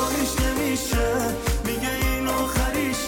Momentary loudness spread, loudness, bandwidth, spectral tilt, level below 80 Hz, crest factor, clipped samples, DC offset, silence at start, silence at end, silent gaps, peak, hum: 2 LU; -24 LUFS; 19.5 kHz; -4 dB/octave; -30 dBFS; 10 dB; under 0.1%; under 0.1%; 0 s; 0 s; none; -14 dBFS; none